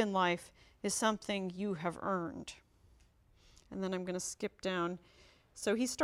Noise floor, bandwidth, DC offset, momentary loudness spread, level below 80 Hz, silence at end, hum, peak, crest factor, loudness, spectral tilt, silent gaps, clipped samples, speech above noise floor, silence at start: -66 dBFS; 16 kHz; under 0.1%; 16 LU; -68 dBFS; 0 s; none; -18 dBFS; 20 dB; -37 LUFS; -4 dB/octave; none; under 0.1%; 30 dB; 0 s